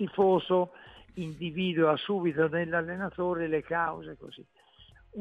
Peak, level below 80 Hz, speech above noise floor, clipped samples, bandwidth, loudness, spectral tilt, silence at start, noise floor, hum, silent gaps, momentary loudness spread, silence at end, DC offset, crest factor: -12 dBFS; -62 dBFS; 28 dB; under 0.1%; 8 kHz; -29 LUFS; -8 dB/octave; 0 s; -57 dBFS; none; none; 19 LU; 0 s; under 0.1%; 18 dB